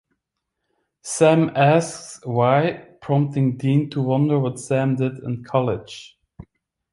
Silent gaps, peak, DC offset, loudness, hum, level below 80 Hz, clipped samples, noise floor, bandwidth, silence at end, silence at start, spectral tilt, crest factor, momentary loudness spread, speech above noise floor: none; -2 dBFS; under 0.1%; -20 LUFS; none; -58 dBFS; under 0.1%; -79 dBFS; 11.5 kHz; 0.5 s; 1.05 s; -6.5 dB/octave; 18 dB; 14 LU; 60 dB